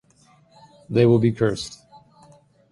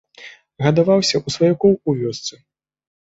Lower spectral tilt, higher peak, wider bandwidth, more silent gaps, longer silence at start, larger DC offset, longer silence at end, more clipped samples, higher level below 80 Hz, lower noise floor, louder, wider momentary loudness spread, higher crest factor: first, -7 dB/octave vs -5.5 dB/octave; about the same, -4 dBFS vs -2 dBFS; first, 11.5 kHz vs 8 kHz; neither; first, 0.9 s vs 0.2 s; neither; first, 0.95 s vs 0.75 s; neither; about the same, -54 dBFS vs -56 dBFS; first, -57 dBFS vs -43 dBFS; second, -20 LUFS vs -17 LUFS; first, 14 LU vs 11 LU; about the same, 18 dB vs 18 dB